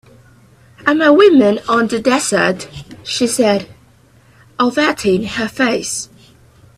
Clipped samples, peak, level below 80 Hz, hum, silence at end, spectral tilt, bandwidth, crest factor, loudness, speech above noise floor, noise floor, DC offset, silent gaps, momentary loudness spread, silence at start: under 0.1%; 0 dBFS; -50 dBFS; none; 0.75 s; -4 dB/octave; 14 kHz; 16 dB; -14 LUFS; 35 dB; -48 dBFS; under 0.1%; none; 15 LU; 0.85 s